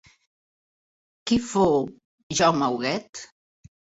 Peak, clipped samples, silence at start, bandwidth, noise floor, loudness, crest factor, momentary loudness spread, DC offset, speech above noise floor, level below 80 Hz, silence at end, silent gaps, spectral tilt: -6 dBFS; under 0.1%; 1.25 s; 8.2 kHz; under -90 dBFS; -23 LUFS; 22 dB; 16 LU; under 0.1%; over 67 dB; -56 dBFS; 0.75 s; 2.05-2.30 s, 3.09-3.13 s; -4.5 dB/octave